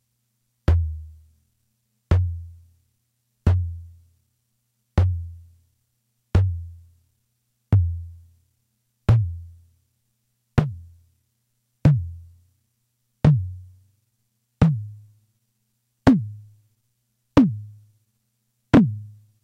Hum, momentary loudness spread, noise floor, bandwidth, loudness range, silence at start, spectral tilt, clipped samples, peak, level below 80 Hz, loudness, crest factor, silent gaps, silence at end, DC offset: 60 Hz at -55 dBFS; 21 LU; -73 dBFS; 7.8 kHz; 4 LU; 0.7 s; -9 dB/octave; under 0.1%; 0 dBFS; -36 dBFS; -22 LUFS; 24 dB; none; 0.35 s; under 0.1%